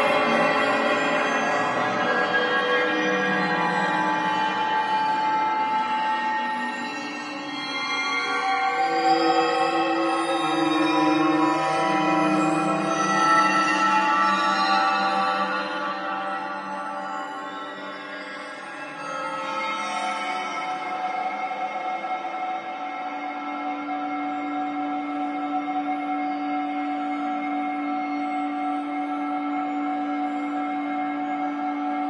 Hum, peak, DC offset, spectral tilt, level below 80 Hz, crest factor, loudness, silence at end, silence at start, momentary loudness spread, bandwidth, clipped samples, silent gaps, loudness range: none; -8 dBFS; under 0.1%; -4 dB/octave; -78 dBFS; 16 dB; -24 LUFS; 0 s; 0 s; 10 LU; 11.5 kHz; under 0.1%; none; 9 LU